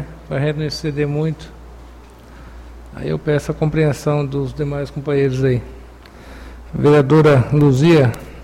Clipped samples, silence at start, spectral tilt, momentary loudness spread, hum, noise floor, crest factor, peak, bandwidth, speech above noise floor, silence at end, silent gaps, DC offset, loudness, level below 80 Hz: under 0.1%; 0 s; -7.5 dB/octave; 19 LU; none; -39 dBFS; 14 dB; -4 dBFS; 12.5 kHz; 24 dB; 0 s; none; under 0.1%; -16 LUFS; -38 dBFS